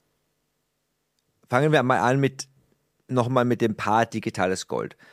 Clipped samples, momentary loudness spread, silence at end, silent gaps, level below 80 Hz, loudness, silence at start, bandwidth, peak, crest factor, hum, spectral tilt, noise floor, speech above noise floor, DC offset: under 0.1%; 10 LU; 0.25 s; none; -66 dBFS; -23 LUFS; 1.5 s; 15 kHz; -4 dBFS; 22 dB; none; -6 dB/octave; -76 dBFS; 53 dB; under 0.1%